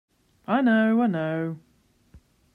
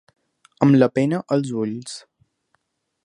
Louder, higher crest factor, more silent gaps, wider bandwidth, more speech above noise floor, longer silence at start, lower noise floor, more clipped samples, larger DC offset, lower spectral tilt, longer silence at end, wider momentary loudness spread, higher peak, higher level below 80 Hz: second, -23 LUFS vs -19 LUFS; second, 16 dB vs 22 dB; neither; second, 4.2 kHz vs 11 kHz; second, 34 dB vs 51 dB; about the same, 0.5 s vs 0.6 s; second, -56 dBFS vs -70 dBFS; neither; neither; about the same, -8.5 dB/octave vs -7.5 dB/octave; second, 0.4 s vs 1.05 s; about the same, 18 LU vs 18 LU; second, -10 dBFS vs 0 dBFS; about the same, -66 dBFS vs -66 dBFS